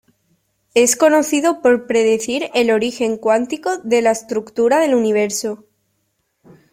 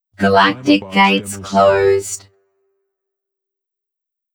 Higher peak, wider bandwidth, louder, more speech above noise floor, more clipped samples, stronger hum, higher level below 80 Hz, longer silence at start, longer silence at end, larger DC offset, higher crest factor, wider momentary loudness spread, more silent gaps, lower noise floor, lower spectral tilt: about the same, -2 dBFS vs -2 dBFS; about the same, 16.5 kHz vs 18 kHz; about the same, -16 LUFS vs -14 LUFS; second, 53 dB vs 62 dB; neither; neither; about the same, -60 dBFS vs -56 dBFS; first, 0.75 s vs 0.2 s; second, 1.15 s vs 2.15 s; neither; about the same, 16 dB vs 16 dB; about the same, 8 LU vs 7 LU; neither; second, -68 dBFS vs -76 dBFS; second, -3 dB/octave vs -4.5 dB/octave